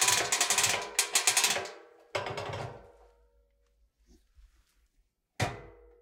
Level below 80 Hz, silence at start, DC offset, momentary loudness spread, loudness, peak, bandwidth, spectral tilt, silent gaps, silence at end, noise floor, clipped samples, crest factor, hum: -62 dBFS; 0 s; under 0.1%; 16 LU; -28 LUFS; -10 dBFS; 18 kHz; -0.5 dB/octave; none; 0.3 s; -74 dBFS; under 0.1%; 24 dB; none